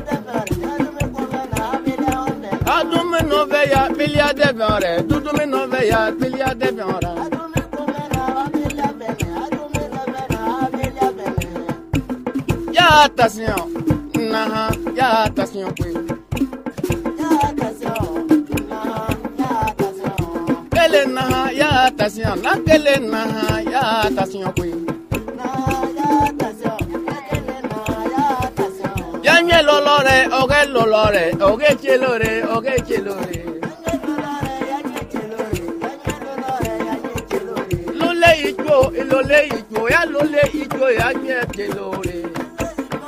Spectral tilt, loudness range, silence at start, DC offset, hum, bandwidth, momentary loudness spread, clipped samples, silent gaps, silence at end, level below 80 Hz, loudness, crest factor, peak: -5 dB/octave; 8 LU; 0 s; under 0.1%; none; 16 kHz; 11 LU; under 0.1%; none; 0 s; -38 dBFS; -18 LUFS; 18 dB; 0 dBFS